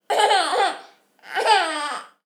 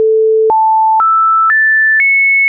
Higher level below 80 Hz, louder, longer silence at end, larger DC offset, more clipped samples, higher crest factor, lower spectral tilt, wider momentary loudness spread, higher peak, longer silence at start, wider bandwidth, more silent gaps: second, under -90 dBFS vs -62 dBFS; second, -20 LUFS vs -8 LUFS; first, 0.2 s vs 0 s; neither; neither; first, 20 dB vs 4 dB; first, 1 dB/octave vs 10 dB/octave; first, 12 LU vs 3 LU; first, -2 dBFS vs -6 dBFS; about the same, 0.1 s vs 0 s; first, 19 kHz vs 3 kHz; neither